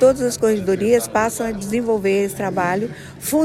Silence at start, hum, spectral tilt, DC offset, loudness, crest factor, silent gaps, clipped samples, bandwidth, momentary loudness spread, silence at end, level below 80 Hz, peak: 0 s; none; -5 dB/octave; under 0.1%; -20 LUFS; 16 dB; none; under 0.1%; 16 kHz; 7 LU; 0 s; -48 dBFS; -4 dBFS